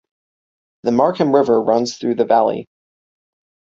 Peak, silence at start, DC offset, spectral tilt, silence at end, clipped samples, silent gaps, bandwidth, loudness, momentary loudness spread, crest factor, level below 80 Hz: -2 dBFS; 0.85 s; under 0.1%; -6 dB/octave; 1.15 s; under 0.1%; none; 7.8 kHz; -16 LUFS; 6 LU; 16 dB; -62 dBFS